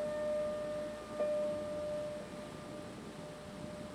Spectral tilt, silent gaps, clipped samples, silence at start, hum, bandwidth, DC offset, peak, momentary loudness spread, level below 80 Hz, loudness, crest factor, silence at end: -5.5 dB/octave; none; under 0.1%; 0 s; none; 13.5 kHz; under 0.1%; -26 dBFS; 11 LU; -64 dBFS; -40 LUFS; 14 dB; 0 s